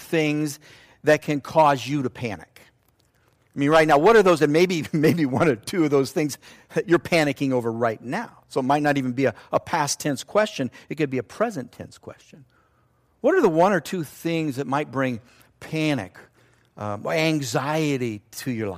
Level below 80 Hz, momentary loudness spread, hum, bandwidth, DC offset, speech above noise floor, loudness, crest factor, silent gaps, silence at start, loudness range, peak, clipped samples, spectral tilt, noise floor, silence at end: -60 dBFS; 13 LU; none; 15.5 kHz; under 0.1%; 41 dB; -22 LUFS; 16 dB; none; 0 s; 7 LU; -6 dBFS; under 0.1%; -5.5 dB/octave; -63 dBFS; 0 s